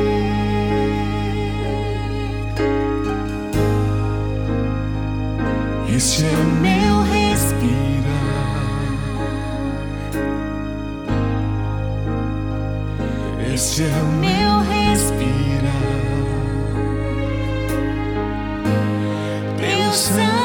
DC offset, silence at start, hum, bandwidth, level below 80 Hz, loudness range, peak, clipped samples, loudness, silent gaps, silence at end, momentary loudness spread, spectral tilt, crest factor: under 0.1%; 0 s; none; 19.5 kHz; -28 dBFS; 6 LU; -4 dBFS; under 0.1%; -20 LUFS; none; 0 s; 8 LU; -5.5 dB/octave; 14 dB